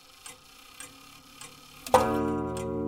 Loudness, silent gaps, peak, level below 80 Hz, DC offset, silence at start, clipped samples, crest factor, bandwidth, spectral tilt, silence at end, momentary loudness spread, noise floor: -27 LUFS; none; -6 dBFS; -54 dBFS; under 0.1%; 0.25 s; under 0.1%; 26 dB; 17.5 kHz; -5 dB/octave; 0 s; 25 LU; -51 dBFS